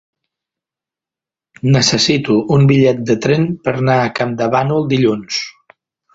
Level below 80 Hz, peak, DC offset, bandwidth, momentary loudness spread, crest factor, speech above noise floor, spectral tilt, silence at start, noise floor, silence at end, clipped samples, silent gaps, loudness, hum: -48 dBFS; 0 dBFS; under 0.1%; 8 kHz; 9 LU; 16 dB; 75 dB; -5.5 dB/octave; 1.65 s; -88 dBFS; 0.65 s; under 0.1%; none; -14 LUFS; none